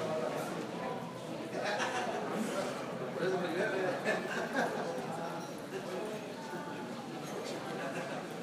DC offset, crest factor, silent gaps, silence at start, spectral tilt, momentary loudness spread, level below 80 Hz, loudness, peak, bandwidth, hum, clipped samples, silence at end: under 0.1%; 18 dB; none; 0 s; -4.5 dB/octave; 8 LU; -78 dBFS; -37 LUFS; -18 dBFS; 15.5 kHz; none; under 0.1%; 0 s